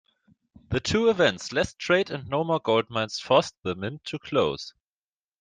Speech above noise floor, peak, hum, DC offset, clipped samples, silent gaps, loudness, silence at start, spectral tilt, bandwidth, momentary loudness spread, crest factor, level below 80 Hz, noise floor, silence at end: over 65 dB; -4 dBFS; none; under 0.1%; under 0.1%; none; -25 LUFS; 0.7 s; -4.5 dB/octave; 9.6 kHz; 10 LU; 22 dB; -54 dBFS; under -90 dBFS; 0.7 s